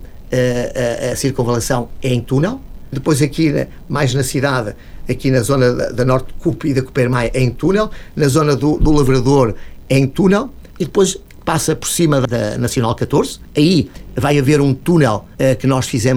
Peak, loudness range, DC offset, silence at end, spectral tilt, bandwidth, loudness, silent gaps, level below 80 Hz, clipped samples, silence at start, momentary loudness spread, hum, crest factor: -2 dBFS; 3 LU; under 0.1%; 0 s; -6 dB/octave; 17 kHz; -16 LUFS; none; -30 dBFS; under 0.1%; 0 s; 8 LU; none; 14 dB